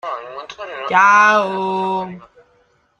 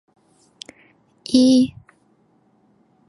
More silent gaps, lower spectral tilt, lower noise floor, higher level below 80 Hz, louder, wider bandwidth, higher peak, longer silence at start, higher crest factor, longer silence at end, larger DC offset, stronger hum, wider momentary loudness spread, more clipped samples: neither; about the same, -4 dB/octave vs -5 dB/octave; about the same, -58 dBFS vs -60 dBFS; second, -64 dBFS vs -58 dBFS; first, -14 LUFS vs -17 LUFS; second, 9.6 kHz vs 11 kHz; about the same, -2 dBFS vs -4 dBFS; second, 0.05 s vs 1.3 s; about the same, 16 dB vs 20 dB; second, 0.75 s vs 1.4 s; neither; neither; second, 21 LU vs 26 LU; neither